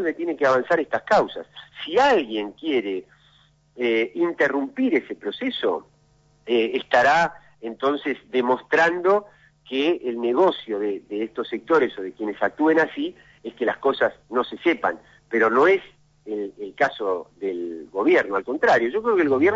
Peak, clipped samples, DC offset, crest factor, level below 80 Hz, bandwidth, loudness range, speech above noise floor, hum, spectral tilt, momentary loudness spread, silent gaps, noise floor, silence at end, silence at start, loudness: -6 dBFS; under 0.1%; under 0.1%; 16 dB; -64 dBFS; 7.8 kHz; 3 LU; 37 dB; none; -5 dB/octave; 12 LU; none; -59 dBFS; 0 s; 0 s; -22 LUFS